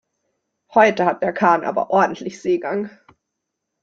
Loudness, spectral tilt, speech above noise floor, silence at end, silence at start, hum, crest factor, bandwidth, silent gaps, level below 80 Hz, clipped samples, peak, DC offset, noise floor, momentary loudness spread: -19 LUFS; -6 dB/octave; 61 dB; 0.95 s; 0.7 s; none; 18 dB; 7.8 kHz; none; -64 dBFS; under 0.1%; -2 dBFS; under 0.1%; -79 dBFS; 11 LU